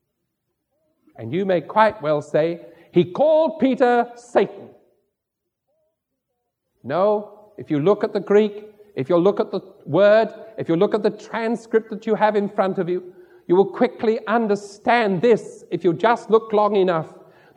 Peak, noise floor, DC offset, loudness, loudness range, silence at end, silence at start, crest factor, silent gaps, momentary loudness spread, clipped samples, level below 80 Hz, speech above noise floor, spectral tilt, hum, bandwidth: -2 dBFS; -80 dBFS; under 0.1%; -20 LUFS; 5 LU; 0.45 s; 1.2 s; 20 dB; none; 10 LU; under 0.1%; -70 dBFS; 61 dB; -7 dB/octave; none; 9.8 kHz